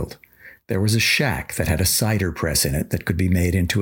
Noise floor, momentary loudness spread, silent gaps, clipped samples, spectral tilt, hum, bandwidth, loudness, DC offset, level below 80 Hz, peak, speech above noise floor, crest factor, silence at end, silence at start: -48 dBFS; 7 LU; none; under 0.1%; -4 dB/octave; none; 17 kHz; -20 LUFS; under 0.1%; -36 dBFS; -4 dBFS; 27 dB; 16 dB; 0 s; 0 s